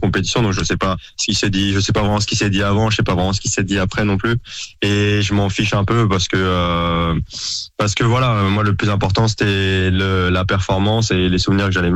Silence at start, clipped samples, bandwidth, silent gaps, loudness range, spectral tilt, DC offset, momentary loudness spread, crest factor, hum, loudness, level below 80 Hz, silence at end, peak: 0 s; under 0.1%; 8.8 kHz; none; 1 LU; -5 dB/octave; under 0.1%; 4 LU; 10 dB; none; -17 LUFS; -34 dBFS; 0 s; -6 dBFS